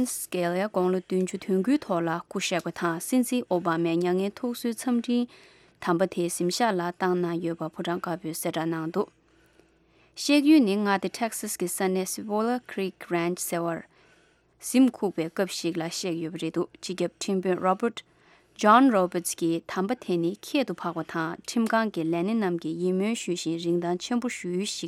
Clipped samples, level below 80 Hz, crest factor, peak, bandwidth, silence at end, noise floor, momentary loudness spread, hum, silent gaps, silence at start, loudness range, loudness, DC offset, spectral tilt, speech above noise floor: under 0.1%; -70 dBFS; 20 dB; -6 dBFS; 16 kHz; 0 s; -62 dBFS; 9 LU; none; none; 0 s; 4 LU; -27 LUFS; under 0.1%; -5 dB/octave; 36 dB